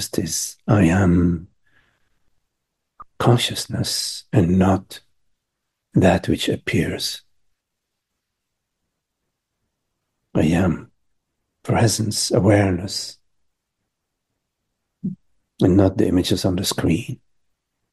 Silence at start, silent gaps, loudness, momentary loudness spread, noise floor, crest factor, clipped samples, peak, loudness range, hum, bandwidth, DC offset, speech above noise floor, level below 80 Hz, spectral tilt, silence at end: 0 s; none; -19 LUFS; 16 LU; -79 dBFS; 20 dB; under 0.1%; -2 dBFS; 6 LU; none; 12.5 kHz; under 0.1%; 61 dB; -46 dBFS; -5.5 dB/octave; 0.75 s